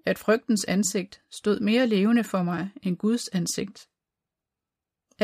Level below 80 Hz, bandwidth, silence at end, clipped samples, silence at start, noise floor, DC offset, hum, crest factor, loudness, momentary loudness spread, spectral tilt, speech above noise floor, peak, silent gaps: -66 dBFS; 15.5 kHz; 0 s; under 0.1%; 0.05 s; -88 dBFS; under 0.1%; none; 18 dB; -25 LUFS; 9 LU; -5 dB/octave; 63 dB; -8 dBFS; none